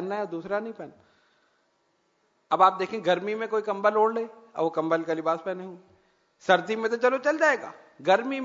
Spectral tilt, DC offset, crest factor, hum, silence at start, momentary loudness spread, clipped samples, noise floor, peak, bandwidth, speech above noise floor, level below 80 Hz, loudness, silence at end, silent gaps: -5 dB/octave; under 0.1%; 22 dB; none; 0 s; 14 LU; under 0.1%; -70 dBFS; -6 dBFS; 7.8 kHz; 45 dB; -78 dBFS; -26 LUFS; 0 s; none